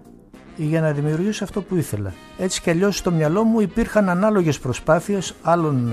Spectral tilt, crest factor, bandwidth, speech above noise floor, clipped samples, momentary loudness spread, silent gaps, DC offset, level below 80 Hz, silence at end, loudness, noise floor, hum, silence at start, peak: -6 dB/octave; 16 dB; 14.5 kHz; 24 dB; under 0.1%; 8 LU; none; under 0.1%; -44 dBFS; 0 s; -20 LUFS; -44 dBFS; none; 0.1 s; -4 dBFS